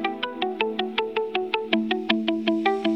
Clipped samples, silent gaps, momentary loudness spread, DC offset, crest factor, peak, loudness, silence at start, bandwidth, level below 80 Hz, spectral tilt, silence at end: under 0.1%; none; 4 LU; 0.1%; 22 dB; -4 dBFS; -25 LUFS; 0 s; 8 kHz; -70 dBFS; -6 dB/octave; 0 s